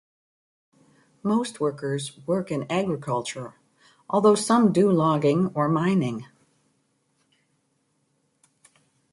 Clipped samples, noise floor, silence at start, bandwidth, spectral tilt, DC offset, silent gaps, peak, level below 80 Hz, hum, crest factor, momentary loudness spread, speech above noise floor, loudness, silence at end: under 0.1%; -71 dBFS; 1.25 s; 11.5 kHz; -6.5 dB/octave; under 0.1%; none; -8 dBFS; -66 dBFS; none; 18 dB; 12 LU; 48 dB; -23 LUFS; 2.9 s